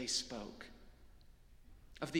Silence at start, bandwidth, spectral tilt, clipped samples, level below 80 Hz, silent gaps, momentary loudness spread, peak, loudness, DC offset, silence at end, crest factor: 0 s; 17 kHz; -2.5 dB/octave; under 0.1%; -62 dBFS; none; 28 LU; -24 dBFS; -44 LUFS; under 0.1%; 0 s; 20 dB